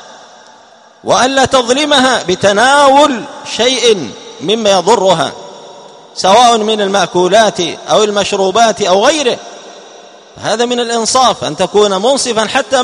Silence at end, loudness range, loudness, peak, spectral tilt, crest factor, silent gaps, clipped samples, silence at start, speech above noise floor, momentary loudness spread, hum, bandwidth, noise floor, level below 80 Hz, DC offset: 0 s; 3 LU; -10 LUFS; 0 dBFS; -2.5 dB/octave; 12 dB; none; 0.3%; 0 s; 31 dB; 12 LU; none; 11 kHz; -41 dBFS; -50 dBFS; under 0.1%